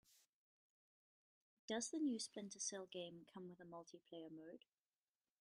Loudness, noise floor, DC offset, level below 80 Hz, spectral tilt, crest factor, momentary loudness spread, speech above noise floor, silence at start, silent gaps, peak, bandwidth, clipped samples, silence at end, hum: -49 LUFS; under -90 dBFS; under 0.1%; under -90 dBFS; -3 dB/octave; 22 dB; 15 LU; over 40 dB; 0.1 s; 0.29-1.68 s; -32 dBFS; 13 kHz; under 0.1%; 0.85 s; none